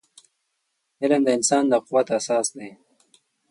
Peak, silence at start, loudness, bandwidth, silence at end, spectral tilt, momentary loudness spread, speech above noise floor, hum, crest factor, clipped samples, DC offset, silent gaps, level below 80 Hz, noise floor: -6 dBFS; 1 s; -21 LUFS; 11.5 kHz; 0.8 s; -3.5 dB/octave; 11 LU; 54 dB; none; 18 dB; under 0.1%; under 0.1%; none; -74 dBFS; -75 dBFS